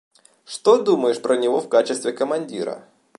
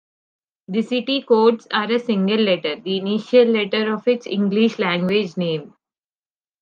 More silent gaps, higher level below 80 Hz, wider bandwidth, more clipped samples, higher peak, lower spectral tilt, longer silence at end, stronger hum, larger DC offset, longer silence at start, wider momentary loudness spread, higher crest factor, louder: neither; about the same, -74 dBFS vs -72 dBFS; first, 11.5 kHz vs 7.2 kHz; neither; about the same, -4 dBFS vs -2 dBFS; second, -4 dB/octave vs -6.5 dB/octave; second, 0.4 s vs 0.9 s; neither; neither; second, 0.5 s vs 0.7 s; first, 13 LU vs 8 LU; about the same, 18 dB vs 16 dB; about the same, -20 LUFS vs -19 LUFS